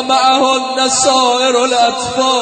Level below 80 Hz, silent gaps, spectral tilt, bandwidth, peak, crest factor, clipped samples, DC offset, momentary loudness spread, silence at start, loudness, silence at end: -54 dBFS; none; -1 dB/octave; 9.4 kHz; 0 dBFS; 12 dB; under 0.1%; under 0.1%; 3 LU; 0 s; -12 LUFS; 0 s